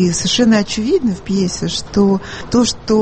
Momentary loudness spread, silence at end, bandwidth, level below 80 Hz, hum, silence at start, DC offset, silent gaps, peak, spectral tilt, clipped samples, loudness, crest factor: 5 LU; 0 s; 8.8 kHz; -38 dBFS; none; 0 s; under 0.1%; none; -2 dBFS; -4.5 dB/octave; under 0.1%; -15 LUFS; 14 dB